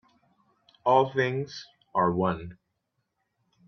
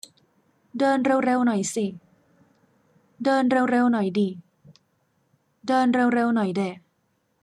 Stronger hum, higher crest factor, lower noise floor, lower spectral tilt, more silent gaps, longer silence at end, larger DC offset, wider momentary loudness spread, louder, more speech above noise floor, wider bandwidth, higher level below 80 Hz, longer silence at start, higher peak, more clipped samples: neither; first, 22 dB vs 14 dB; first, -79 dBFS vs -70 dBFS; first, -7 dB/octave vs -5.5 dB/octave; neither; first, 1.15 s vs 0.65 s; neither; first, 16 LU vs 10 LU; second, -27 LUFS vs -23 LUFS; first, 53 dB vs 49 dB; second, 6.6 kHz vs 12 kHz; first, -62 dBFS vs -74 dBFS; about the same, 0.85 s vs 0.75 s; about the same, -8 dBFS vs -10 dBFS; neither